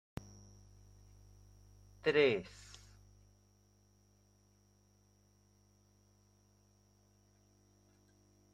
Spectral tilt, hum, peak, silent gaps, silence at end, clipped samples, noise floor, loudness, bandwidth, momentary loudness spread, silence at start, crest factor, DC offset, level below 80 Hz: -5 dB/octave; 50 Hz at -65 dBFS; -18 dBFS; none; 6.05 s; under 0.1%; -70 dBFS; -33 LUFS; 12 kHz; 28 LU; 2.05 s; 26 dB; under 0.1%; -68 dBFS